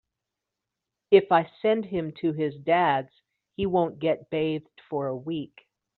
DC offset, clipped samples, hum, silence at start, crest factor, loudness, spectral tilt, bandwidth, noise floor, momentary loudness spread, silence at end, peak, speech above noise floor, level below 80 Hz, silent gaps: under 0.1%; under 0.1%; none; 1.1 s; 22 dB; -26 LUFS; -4.5 dB/octave; 4.4 kHz; -86 dBFS; 13 LU; 0.5 s; -6 dBFS; 61 dB; -62 dBFS; none